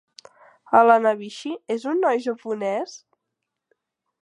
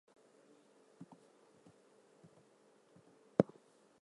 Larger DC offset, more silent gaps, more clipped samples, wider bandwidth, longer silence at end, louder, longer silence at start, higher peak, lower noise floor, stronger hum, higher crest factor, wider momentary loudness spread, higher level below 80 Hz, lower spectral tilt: neither; neither; neither; about the same, 10.5 kHz vs 11 kHz; first, 1.25 s vs 0.6 s; first, -21 LUFS vs -37 LUFS; second, 0.7 s vs 3.4 s; first, -2 dBFS vs -10 dBFS; first, -81 dBFS vs -69 dBFS; neither; second, 22 dB vs 36 dB; second, 15 LU vs 29 LU; about the same, -82 dBFS vs -80 dBFS; second, -5 dB/octave vs -8.5 dB/octave